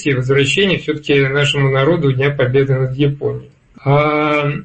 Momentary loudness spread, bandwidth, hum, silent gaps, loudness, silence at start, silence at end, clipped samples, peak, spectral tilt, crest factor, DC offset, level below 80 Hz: 5 LU; 8.8 kHz; none; none; -15 LUFS; 0 s; 0 s; under 0.1%; -4 dBFS; -6 dB/octave; 12 dB; under 0.1%; -44 dBFS